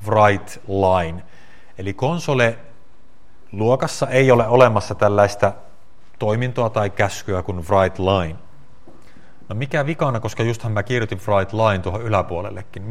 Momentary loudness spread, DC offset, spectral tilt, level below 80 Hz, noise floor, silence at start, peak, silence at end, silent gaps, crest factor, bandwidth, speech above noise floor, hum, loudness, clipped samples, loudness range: 14 LU; 2%; -6 dB/octave; -50 dBFS; -54 dBFS; 0 s; 0 dBFS; 0 s; none; 20 dB; 14 kHz; 35 dB; none; -19 LUFS; under 0.1%; 5 LU